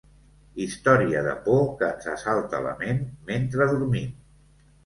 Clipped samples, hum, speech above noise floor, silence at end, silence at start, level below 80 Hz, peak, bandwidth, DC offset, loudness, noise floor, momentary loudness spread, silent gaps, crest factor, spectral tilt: under 0.1%; none; 32 dB; 0.7 s; 0.55 s; -52 dBFS; -4 dBFS; 11.5 kHz; under 0.1%; -25 LUFS; -56 dBFS; 11 LU; none; 22 dB; -7 dB/octave